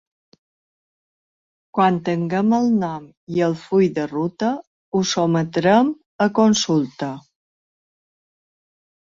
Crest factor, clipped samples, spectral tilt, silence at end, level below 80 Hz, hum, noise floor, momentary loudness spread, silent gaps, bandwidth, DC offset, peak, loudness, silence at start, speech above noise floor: 18 dB; under 0.1%; -5.5 dB/octave; 1.9 s; -62 dBFS; none; under -90 dBFS; 11 LU; 3.17-3.27 s, 4.67-4.92 s, 6.06-6.19 s; 7.6 kHz; under 0.1%; -4 dBFS; -20 LUFS; 1.75 s; over 71 dB